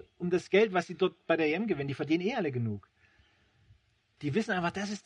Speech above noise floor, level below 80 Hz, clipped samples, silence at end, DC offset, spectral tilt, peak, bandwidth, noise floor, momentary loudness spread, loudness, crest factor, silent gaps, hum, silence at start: 36 dB; -70 dBFS; under 0.1%; 0.05 s; under 0.1%; -6 dB/octave; -12 dBFS; 10 kHz; -66 dBFS; 8 LU; -31 LUFS; 20 dB; none; none; 0.2 s